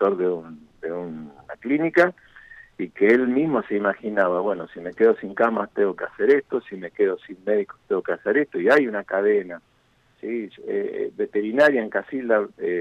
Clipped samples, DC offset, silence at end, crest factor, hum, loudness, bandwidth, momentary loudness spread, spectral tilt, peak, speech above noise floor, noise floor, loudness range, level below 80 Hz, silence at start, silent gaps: under 0.1%; under 0.1%; 0 s; 16 dB; none; -22 LUFS; 8.4 kHz; 14 LU; -7 dB/octave; -6 dBFS; 40 dB; -62 dBFS; 2 LU; -66 dBFS; 0 s; none